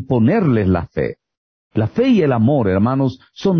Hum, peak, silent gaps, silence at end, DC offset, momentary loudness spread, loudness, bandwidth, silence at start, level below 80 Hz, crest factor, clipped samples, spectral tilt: none; -6 dBFS; 1.37-1.71 s; 0 s; under 0.1%; 9 LU; -17 LUFS; 6.4 kHz; 0 s; -38 dBFS; 10 dB; under 0.1%; -9 dB/octave